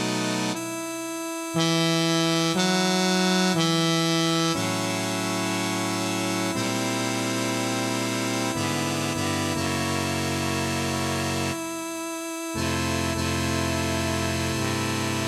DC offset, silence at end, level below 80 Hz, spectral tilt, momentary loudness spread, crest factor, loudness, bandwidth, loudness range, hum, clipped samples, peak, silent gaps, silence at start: under 0.1%; 0 s; -52 dBFS; -4 dB/octave; 7 LU; 16 dB; -25 LUFS; 16 kHz; 5 LU; none; under 0.1%; -10 dBFS; none; 0 s